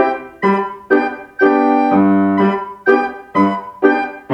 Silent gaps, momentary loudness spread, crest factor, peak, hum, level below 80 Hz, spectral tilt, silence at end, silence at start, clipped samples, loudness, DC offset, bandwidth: none; 6 LU; 14 dB; 0 dBFS; none; -58 dBFS; -8.5 dB/octave; 0 s; 0 s; under 0.1%; -15 LUFS; under 0.1%; 5.8 kHz